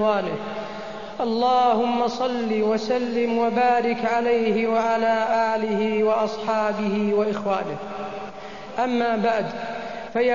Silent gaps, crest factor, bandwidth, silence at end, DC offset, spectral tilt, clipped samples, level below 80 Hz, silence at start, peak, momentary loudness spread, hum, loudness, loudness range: none; 14 dB; 7.4 kHz; 0 s; 0.6%; -6 dB/octave; under 0.1%; -58 dBFS; 0 s; -8 dBFS; 12 LU; none; -23 LUFS; 3 LU